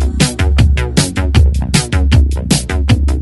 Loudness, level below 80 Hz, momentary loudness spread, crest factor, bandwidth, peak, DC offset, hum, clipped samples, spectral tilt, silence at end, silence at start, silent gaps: -13 LUFS; -14 dBFS; 2 LU; 12 dB; 12 kHz; 0 dBFS; under 0.1%; none; under 0.1%; -5 dB/octave; 0 s; 0 s; none